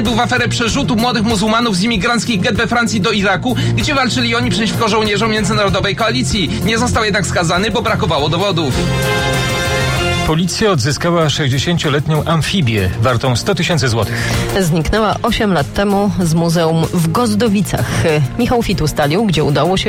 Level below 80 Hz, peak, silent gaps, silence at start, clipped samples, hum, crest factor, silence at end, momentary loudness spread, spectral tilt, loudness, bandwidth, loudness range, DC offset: -30 dBFS; -4 dBFS; none; 0 s; under 0.1%; none; 10 dB; 0 s; 2 LU; -5 dB/octave; -14 LUFS; 16.5 kHz; 1 LU; under 0.1%